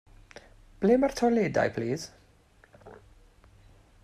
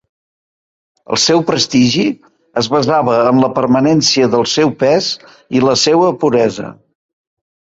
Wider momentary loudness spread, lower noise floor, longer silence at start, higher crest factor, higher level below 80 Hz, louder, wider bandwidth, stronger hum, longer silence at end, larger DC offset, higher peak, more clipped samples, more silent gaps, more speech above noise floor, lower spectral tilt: about the same, 11 LU vs 9 LU; second, -60 dBFS vs under -90 dBFS; second, 0.8 s vs 1.1 s; first, 20 dB vs 14 dB; about the same, -56 dBFS vs -54 dBFS; second, -27 LUFS vs -12 LUFS; first, 14 kHz vs 8 kHz; neither; about the same, 1.1 s vs 1.05 s; neither; second, -10 dBFS vs 0 dBFS; neither; neither; second, 35 dB vs over 78 dB; first, -6 dB/octave vs -4.5 dB/octave